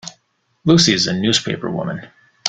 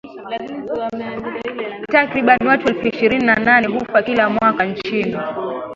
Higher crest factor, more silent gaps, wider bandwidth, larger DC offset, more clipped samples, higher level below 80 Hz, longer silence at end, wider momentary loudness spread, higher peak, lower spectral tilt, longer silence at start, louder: about the same, 18 dB vs 18 dB; neither; first, 9.4 kHz vs 7.6 kHz; neither; neither; about the same, -50 dBFS vs -52 dBFS; about the same, 0 s vs 0 s; first, 16 LU vs 13 LU; about the same, 0 dBFS vs 0 dBFS; second, -4 dB/octave vs -6.5 dB/octave; about the same, 0.05 s vs 0.05 s; about the same, -16 LUFS vs -17 LUFS